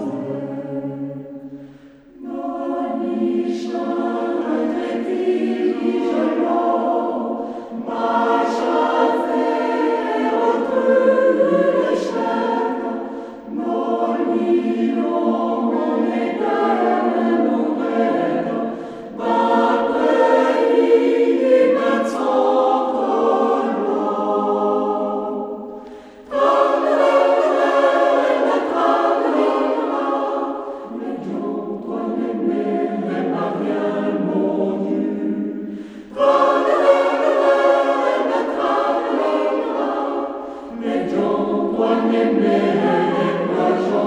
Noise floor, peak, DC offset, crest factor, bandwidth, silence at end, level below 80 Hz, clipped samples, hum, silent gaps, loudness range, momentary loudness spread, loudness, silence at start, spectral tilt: -44 dBFS; -2 dBFS; under 0.1%; 18 dB; 10 kHz; 0 s; -62 dBFS; under 0.1%; none; none; 6 LU; 12 LU; -19 LUFS; 0 s; -6.5 dB/octave